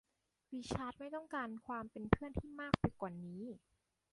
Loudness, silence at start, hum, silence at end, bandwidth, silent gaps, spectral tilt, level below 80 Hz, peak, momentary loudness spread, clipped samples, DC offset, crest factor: -42 LUFS; 0.5 s; none; 0.55 s; 11.5 kHz; none; -7 dB/octave; -56 dBFS; -12 dBFS; 13 LU; under 0.1%; under 0.1%; 30 dB